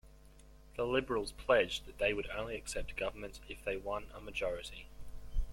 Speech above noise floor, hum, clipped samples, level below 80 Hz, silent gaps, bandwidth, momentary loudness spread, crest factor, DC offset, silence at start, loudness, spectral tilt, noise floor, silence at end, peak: 21 dB; none; under 0.1%; -46 dBFS; none; 16.5 kHz; 17 LU; 22 dB; under 0.1%; 0.05 s; -37 LUFS; -4 dB/octave; -58 dBFS; 0 s; -16 dBFS